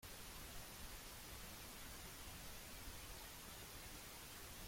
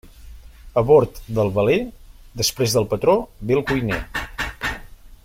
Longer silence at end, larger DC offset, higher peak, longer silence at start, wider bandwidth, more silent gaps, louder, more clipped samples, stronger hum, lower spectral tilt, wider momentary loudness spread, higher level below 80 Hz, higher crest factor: about the same, 0 s vs 0.1 s; neither; second, -40 dBFS vs -4 dBFS; about the same, 0 s vs 0.05 s; about the same, 16.5 kHz vs 16.5 kHz; neither; second, -54 LUFS vs -20 LUFS; neither; neither; second, -2.5 dB/octave vs -5 dB/octave; second, 0 LU vs 12 LU; second, -62 dBFS vs -40 dBFS; about the same, 14 dB vs 18 dB